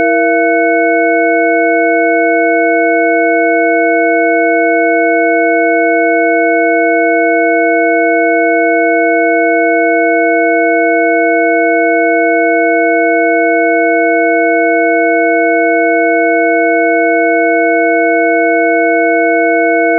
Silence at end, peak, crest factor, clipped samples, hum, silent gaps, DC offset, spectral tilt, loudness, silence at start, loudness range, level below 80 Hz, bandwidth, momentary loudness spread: 0 s; 0 dBFS; 10 dB; under 0.1%; 50 Hz at -95 dBFS; none; under 0.1%; -5.5 dB/octave; -10 LUFS; 0 s; 0 LU; under -90 dBFS; 2.4 kHz; 0 LU